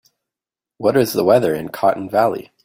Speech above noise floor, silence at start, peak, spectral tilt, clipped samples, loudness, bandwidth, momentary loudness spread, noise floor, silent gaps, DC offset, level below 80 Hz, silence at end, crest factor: 72 dB; 0.8 s; -2 dBFS; -6 dB/octave; under 0.1%; -17 LUFS; 16.5 kHz; 6 LU; -89 dBFS; none; under 0.1%; -56 dBFS; 0.25 s; 16 dB